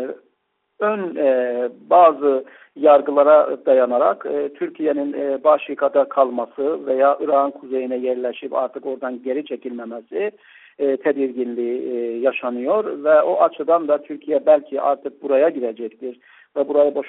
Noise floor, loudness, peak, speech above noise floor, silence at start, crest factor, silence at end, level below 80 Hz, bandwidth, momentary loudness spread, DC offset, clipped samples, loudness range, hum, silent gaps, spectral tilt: -71 dBFS; -19 LUFS; -2 dBFS; 52 dB; 0 s; 18 dB; 0 s; -72 dBFS; 4 kHz; 13 LU; under 0.1%; under 0.1%; 8 LU; none; none; -3.5 dB/octave